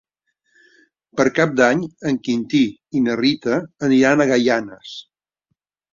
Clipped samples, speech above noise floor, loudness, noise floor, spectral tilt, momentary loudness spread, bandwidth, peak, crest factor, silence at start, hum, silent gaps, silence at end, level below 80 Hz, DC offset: under 0.1%; 57 dB; -18 LUFS; -75 dBFS; -5.5 dB/octave; 15 LU; 7.6 kHz; -2 dBFS; 18 dB; 1.15 s; none; none; 0.95 s; -60 dBFS; under 0.1%